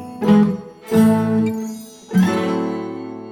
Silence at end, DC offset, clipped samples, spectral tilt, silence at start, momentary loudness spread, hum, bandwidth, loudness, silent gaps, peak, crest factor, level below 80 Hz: 0 s; under 0.1%; under 0.1%; -7.5 dB/octave; 0 s; 15 LU; none; 17 kHz; -18 LUFS; none; -2 dBFS; 16 dB; -58 dBFS